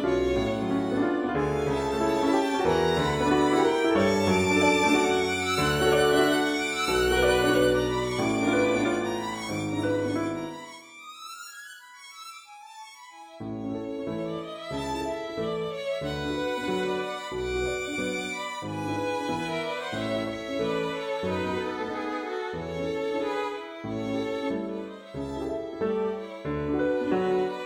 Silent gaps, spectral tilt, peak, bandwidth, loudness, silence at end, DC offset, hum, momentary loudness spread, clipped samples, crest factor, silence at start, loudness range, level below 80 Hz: none; -5 dB/octave; -10 dBFS; 20 kHz; -27 LUFS; 0 s; under 0.1%; none; 16 LU; under 0.1%; 18 dB; 0 s; 12 LU; -48 dBFS